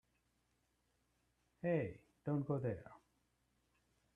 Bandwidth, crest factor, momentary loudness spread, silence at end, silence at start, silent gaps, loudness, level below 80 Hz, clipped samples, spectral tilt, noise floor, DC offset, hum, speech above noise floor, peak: 3.9 kHz; 20 dB; 11 LU; 1.2 s; 1.65 s; none; -42 LUFS; -76 dBFS; under 0.1%; -10 dB/octave; -82 dBFS; under 0.1%; none; 42 dB; -26 dBFS